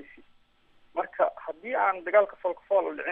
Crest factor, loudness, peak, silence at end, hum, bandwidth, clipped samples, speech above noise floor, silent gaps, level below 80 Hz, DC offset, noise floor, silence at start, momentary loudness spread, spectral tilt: 20 dB; -27 LUFS; -10 dBFS; 0 s; none; 3.8 kHz; under 0.1%; 35 dB; none; -70 dBFS; under 0.1%; -61 dBFS; 0 s; 11 LU; -6.5 dB/octave